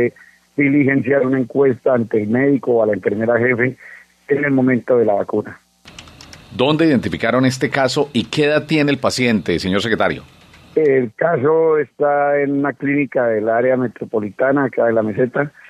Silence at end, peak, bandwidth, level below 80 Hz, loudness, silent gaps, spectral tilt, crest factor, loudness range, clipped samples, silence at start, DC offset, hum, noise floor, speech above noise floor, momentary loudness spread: 0.2 s; 0 dBFS; 13 kHz; -58 dBFS; -17 LUFS; none; -6 dB/octave; 16 dB; 2 LU; under 0.1%; 0 s; under 0.1%; none; -41 dBFS; 25 dB; 5 LU